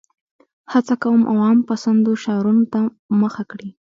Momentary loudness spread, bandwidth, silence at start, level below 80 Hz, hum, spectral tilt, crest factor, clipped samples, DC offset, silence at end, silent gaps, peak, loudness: 7 LU; 7.6 kHz; 0.7 s; -66 dBFS; none; -7.5 dB/octave; 14 dB; under 0.1%; under 0.1%; 0.15 s; 2.99-3.09 s; -4 dBFS; -18 LUFS